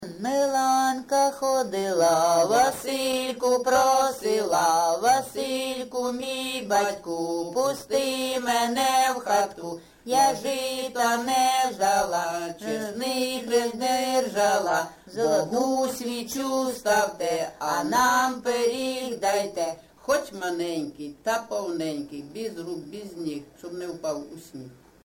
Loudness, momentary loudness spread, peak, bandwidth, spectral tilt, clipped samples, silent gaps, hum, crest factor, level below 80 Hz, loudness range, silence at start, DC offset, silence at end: -25 LUFS; 13 LU; -8 dBFS; 17 kHz; -2.5 dB/octave; under 0.1%; none; none; 16 dB; -62 dBFS; 7 LU; 0 s; under 0.1%; 0.3 s